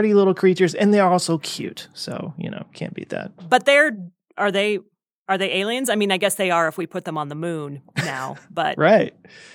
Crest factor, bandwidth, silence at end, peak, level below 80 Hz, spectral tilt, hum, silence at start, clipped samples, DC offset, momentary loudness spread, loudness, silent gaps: 20 dB; 18 kHz; 0.1 s; 0 dBFS; -72 dBFS; -4.5 dB/octave; none; 0 s; under 0.1%; under 0.1%; 16 LU; -20 LUFS; 5.18-5.26 s